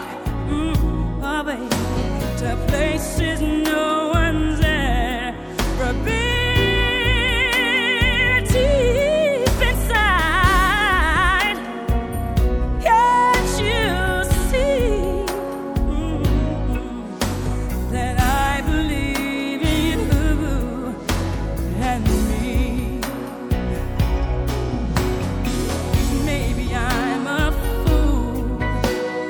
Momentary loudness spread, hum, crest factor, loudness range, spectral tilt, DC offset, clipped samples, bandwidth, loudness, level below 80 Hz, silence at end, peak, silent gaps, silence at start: 8 LU; none; 16 dB; 6 LU; -5 dB/octave; under 0.1%; under 0.1%; over 20 kHz; -20 LUFS; -24 dBFS; 0 s; -2 dBFS; none; 0 s